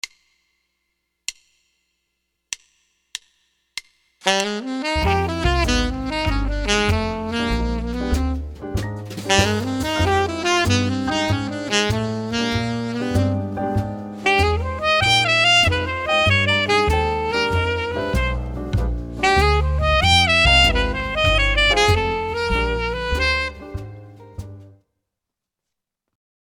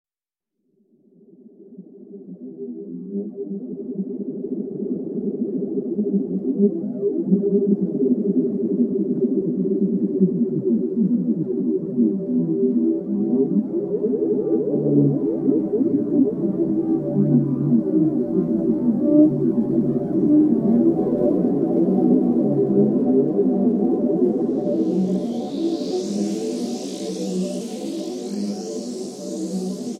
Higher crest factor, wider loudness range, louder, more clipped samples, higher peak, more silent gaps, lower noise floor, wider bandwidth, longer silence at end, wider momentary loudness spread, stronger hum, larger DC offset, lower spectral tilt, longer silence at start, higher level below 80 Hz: about the same, 20 dB vs 16 dB; about the same, 11 LU vs 10 LU; about the same, -19 LUFS vs -21 LUFS; neither; first, 0 dBFS vs -4 dBFS; neither; second, -84 dBFS vs -89 dBFS; first, 18.5 kHz vs 11 kHz; first, 1.75 s vs 0 s; first, 18 LU vs 11 LU; neither; neither; second, -4 dB/octave vs -8.5 dB/octave; second, 0.05 s vs 1.45 s; first, -28 dBFS vs -60 dBFS